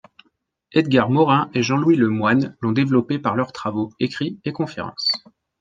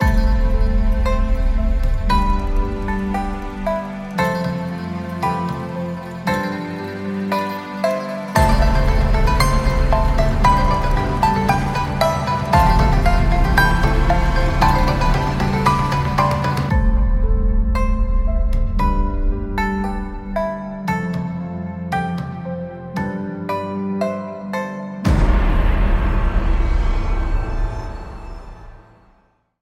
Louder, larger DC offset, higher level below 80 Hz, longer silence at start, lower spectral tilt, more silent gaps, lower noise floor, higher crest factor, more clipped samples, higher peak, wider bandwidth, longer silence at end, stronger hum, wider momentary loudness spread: about the same, -20 LUFS vs -20 LUFS; neither; second, -62 dBFS vs -20 dBFS; first, 0.75 s vs 0 s; about the same, -6.5 dB/octave vs -6.5 dB/octave; neither; first, -67 dBFS vs -58 dBFS; about the same, 18 dB vs 16 dB; neither; about the same, -2 dBFS vs -2 dBFS; second, 7.6 kHz vs 13.5 kHz; second, 0.4 s vs 0.85 s; neither; about the same, 10 LU vs 10 LU